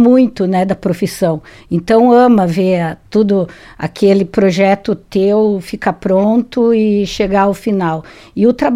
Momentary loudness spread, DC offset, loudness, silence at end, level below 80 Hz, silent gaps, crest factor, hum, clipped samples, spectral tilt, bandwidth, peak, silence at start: 9 LU; under 0.1%; -13 LUFS; 0 s; -44 dBFS; none; 12 dB; none; under 0.1%; -7 dB/octave; 14.5 kHz; 0 dBFS; 0 s